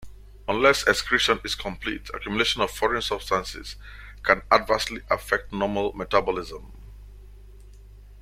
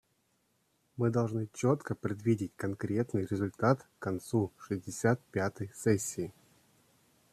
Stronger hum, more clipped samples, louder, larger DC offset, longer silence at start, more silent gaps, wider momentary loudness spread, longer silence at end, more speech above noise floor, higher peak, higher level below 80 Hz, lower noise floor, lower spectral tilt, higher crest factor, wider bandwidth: first, 50 Hz at -45 dBFS vs none; neither; first, -24 LUFS vs -33 LUFS; neither; second, 0 s vs 0.95 s; neither; first, 16 LU vs 8 LU; second, 0 s vs 1 s; second, 21 dB vs 43 dB; first, -2 dBFS vs -12 dBFS; first, -44 dBFS vs -68 dBFS; second, -46 dBFS vs -75 dBFS; second, -3 dB/octave vs -6.5 dB/octave; about the same, 24 dB vs 22 dB; first, 16.5 kHz vs 14.5 kHz